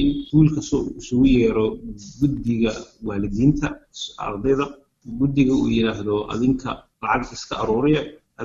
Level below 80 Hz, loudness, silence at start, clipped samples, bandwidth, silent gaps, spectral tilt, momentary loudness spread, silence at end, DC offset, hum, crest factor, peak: -38 dBFS; -21 LUFS; 0 s; under 0.1%; 7.6 kHz; none; -7 dB/octave; 12 LU; 0 s; under 0.1%; none; 16 dB; -4 dBFS